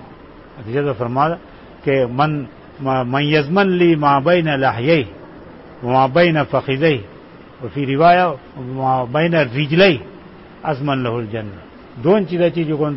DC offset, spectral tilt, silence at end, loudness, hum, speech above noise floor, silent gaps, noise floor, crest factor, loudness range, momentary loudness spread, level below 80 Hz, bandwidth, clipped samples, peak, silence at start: under 0.1%; -10.5 dB/octave; 0 s; -17 LUFS; none; 24 dB; none; -40 dBFS; 16 dB; 3 LU; 15 LU; -50 dBFS; 5.8 kHz; under 0.1%; -2 dBFS; 0 s